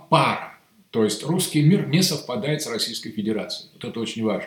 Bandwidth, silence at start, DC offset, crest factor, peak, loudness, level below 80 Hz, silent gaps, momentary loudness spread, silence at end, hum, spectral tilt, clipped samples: 18 kHz; 0 s; under 0.1%; 20 dB; -2 dBFS; -23 LUFS; -68 dBFS; none; 12 LU; 0 s; none; -5 dB/octave; under 0.1%